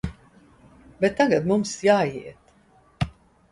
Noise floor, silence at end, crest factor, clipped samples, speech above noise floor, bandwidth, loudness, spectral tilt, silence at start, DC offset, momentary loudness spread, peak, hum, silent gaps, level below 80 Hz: -58 dBFS; 0.45 s; 20 dB; under 0.1%; 36 dB; 11.5 kHz; -23 LUFS; -5.5 dB/octave; 0.05 s; under 0.1%; 16 LU; -6 dBFS; none; none; -48 dBFS